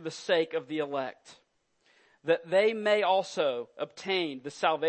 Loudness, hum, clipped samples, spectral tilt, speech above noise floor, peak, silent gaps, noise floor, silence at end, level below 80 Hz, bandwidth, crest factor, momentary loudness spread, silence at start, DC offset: -29 LUFS; none; under 0.1%; -4 dB/octave; 41 dB; -10 dBFS; none; -70 dBFS; 0 s; -86 dBFS; 8.8 kHz; 20 dB; 11 LU; 0 s; under 0.1%